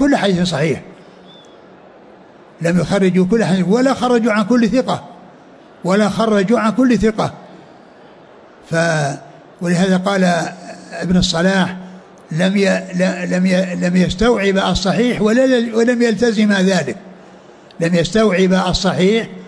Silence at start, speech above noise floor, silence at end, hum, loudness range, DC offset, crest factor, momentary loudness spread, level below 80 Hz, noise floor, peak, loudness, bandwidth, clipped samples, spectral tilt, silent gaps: 0 s; 28 dB; 0 s; none; 4 LU; under 0.1%; 12 dB; 9 LU; -40 dBFS; -42 dBFS; -4 dBFS; -15 LUFS; 10.5 kHz; under 0.1%; -6 dB/octave; none